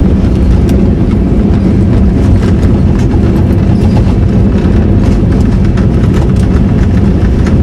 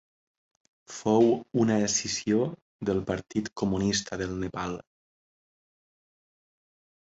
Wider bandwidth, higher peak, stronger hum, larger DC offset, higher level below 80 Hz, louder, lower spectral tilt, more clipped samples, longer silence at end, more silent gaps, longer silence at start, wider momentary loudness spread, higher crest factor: first, 10.5 kHz vs 8.2 kHz; first, 0 dBFS vs -10 dBFS; neither; neither; first, -12 dBFS vs -54 dBFS; first, -8 LUFS vs -28 LUFS; first, -9 dB/octave vs -4.5 dB/octave; first, 2% vs under 0.1%; second, 0 s vs 2.25 s; second, none vs 2.62-2.79 s; second, 0 s vs 0.9 s; second, 1 LU vs 12 LU; second, 6 dB vs 20 dB